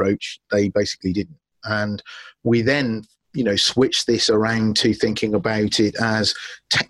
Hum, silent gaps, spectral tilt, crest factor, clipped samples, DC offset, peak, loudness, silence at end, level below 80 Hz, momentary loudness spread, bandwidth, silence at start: none; none; -4 dB/octave; 16 dB; under 0.1%; under 0.1%; -6 dBFS; -20 LUFS; 0.05 s; -52 dBFS; 11 LU; 12.5 kHz; 0 s